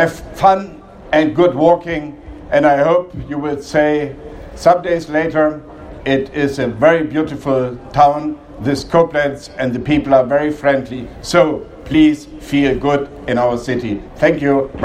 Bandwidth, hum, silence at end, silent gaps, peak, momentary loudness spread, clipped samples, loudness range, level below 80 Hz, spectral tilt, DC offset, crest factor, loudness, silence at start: 14 kHz; none; 0 s; none; 0 dBFS; 12 LU; under 0.1%; 2 LU; -40 dBFS; -6.5 dB/octave; under 0.1%; 16 dB; -15 LUFS; 0 s